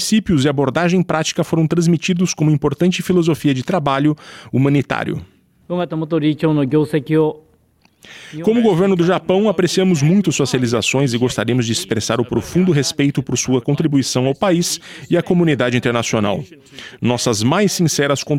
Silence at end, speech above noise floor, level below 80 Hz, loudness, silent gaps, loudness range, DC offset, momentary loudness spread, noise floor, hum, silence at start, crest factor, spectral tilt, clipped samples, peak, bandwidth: 0 s; 40 dB; -48 dBFS; -17 LUFS; none; 3 LU; under 0.1%; 7 LU; -56 dBFS; none; 0 s; 14 dB; -5.5 dB/octave; under 0.1%; -2 dBFS; 16 kHz